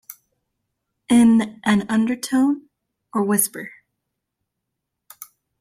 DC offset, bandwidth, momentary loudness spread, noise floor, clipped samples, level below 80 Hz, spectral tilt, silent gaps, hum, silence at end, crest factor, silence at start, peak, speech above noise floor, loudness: under 0.1%; 16 kHz; 23 LU; -80 dBFS; under 0.1%; -60 dBFS; -4.5 dB/octave; none; none; 0.35 s; 18 dB; 1.1 s; -4 dBFS; 60 dB; -19 LUFS